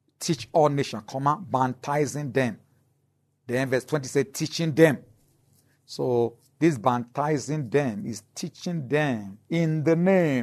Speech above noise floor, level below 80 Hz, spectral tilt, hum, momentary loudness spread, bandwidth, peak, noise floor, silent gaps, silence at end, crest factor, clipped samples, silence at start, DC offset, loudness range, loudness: 46 dB; -68 dBFS; -6 dB/octave; none; 12 LU; 13.5 kHz; -4 dBFS; -70 dBFS; none; 0 s; 22 dB; under 0.1%; 0.2 s; under 0.1%; 2 LU; -25 LUFS